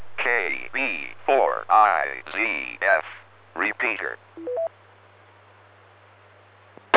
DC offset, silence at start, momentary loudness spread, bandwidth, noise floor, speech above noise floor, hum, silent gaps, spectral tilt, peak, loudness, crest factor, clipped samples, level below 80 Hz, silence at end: under 0.1%; 0 s; 14 LU; 4 kHz; -53 dBFS; 29 dB; none; none; -6.5 dB/octave; 0 dBFS; -23 LUFS; 26 dB; under 0.1%; -74 dBFS; 0 s